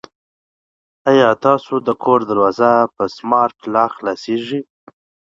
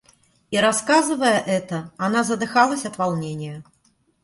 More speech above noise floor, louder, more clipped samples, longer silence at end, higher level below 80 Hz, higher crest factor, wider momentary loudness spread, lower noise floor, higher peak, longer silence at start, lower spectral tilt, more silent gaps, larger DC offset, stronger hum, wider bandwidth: first, over 75 dB vs 42 dB; first, -16 LUFS vs -21 LUFS; neither; first, 0.75 s vs 0.6 s; about the same, -62 dBFS vs -62 dBFS; about the same, 16 dB vs 20 dB; second, 9 LU vs 13 LU; first, under -90 dBFS vs -63 dBFS; about the same, 0 dBFS vs -2 dBFS; first, 1.05 s vs 0.5 s; first, -6.5 dB/octave vs -4 dB/octave; neither; neither; neither; second, 7.6 kHz vs 11.5 kHz